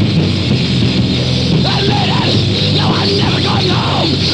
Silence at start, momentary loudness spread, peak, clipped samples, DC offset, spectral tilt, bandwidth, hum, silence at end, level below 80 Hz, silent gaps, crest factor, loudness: 0 s; 2 LU; -2 dBFS; under 0.1%; 0.2%; -6 dB/octave; 10 kHz; none; 0 s; -36 dBFS; none; 12 dB; -12 LUFS